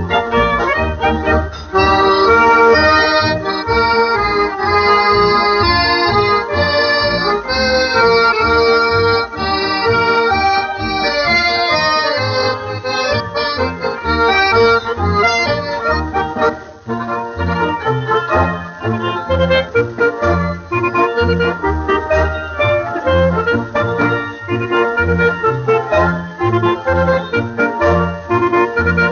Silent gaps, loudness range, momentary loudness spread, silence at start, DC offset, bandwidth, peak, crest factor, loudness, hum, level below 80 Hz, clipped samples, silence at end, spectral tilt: none; 4 LU; 7 LU; 0 s; under 0.1%; 6.8 kHz; -2 dBFS; 12 dB; -14 LUFS; none; -34 dBFS; under 0.1%; 0 s; -3 dB/octave